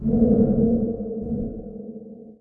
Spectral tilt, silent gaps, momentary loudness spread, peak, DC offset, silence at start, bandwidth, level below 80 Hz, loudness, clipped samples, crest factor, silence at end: -14.5 dB/octave; none; 20 LU; -6 dBFS; under 0.1%; 0 s; 1.6 kHz; -38 dBFS; -22 LUFS; under 0.1%; 16 dB; 0.05 s